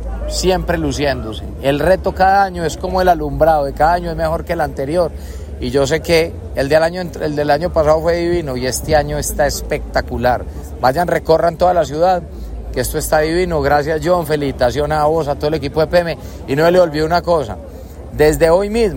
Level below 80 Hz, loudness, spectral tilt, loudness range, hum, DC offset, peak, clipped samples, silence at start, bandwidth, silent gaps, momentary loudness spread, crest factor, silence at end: -28 dBFS; -16 LUFS; -5 dB/octave; 2 LU; none; under 0.1%; 0 dBFS; under 0.1%; 0 s; 16.5 kHz; none; 9 LU; 14 dB; 0 s